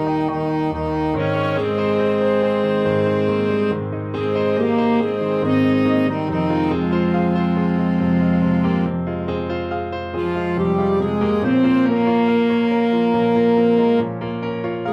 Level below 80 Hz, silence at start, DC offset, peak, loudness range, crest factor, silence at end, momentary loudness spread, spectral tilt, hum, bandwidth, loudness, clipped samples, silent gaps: -46 dBFS; 0 s; under 0.1%; -6 dBFS; 3 LU; 12 dB; 0 s; 8 LU; -9 dB/octave; none; 6.6 kHz; -19 LUFS; under 0.1%; none